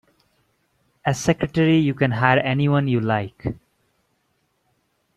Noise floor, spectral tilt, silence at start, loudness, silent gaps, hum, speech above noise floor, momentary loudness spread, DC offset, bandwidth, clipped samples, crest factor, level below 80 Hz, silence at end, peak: -69 dBFS; -6.5 dB/octave; 1.05 s; -20 LUFS; none; none; 50 dB; 13 LU; under 0.1%; 12.5 kHz; under 0.1%; 22 dB; -50 dBFS; 1.6 s; 0 dBFS